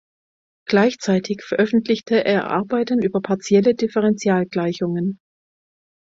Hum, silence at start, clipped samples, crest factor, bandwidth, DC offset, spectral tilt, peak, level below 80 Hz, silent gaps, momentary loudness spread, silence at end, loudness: none; 0.7 s; under 0.1%; 18 dB; 7.8 kHz; under 0.1%; -6 dB/octave; -2 dBFS; -62 dBFS; none; 6 LU; 0.95 s; -20 LUFS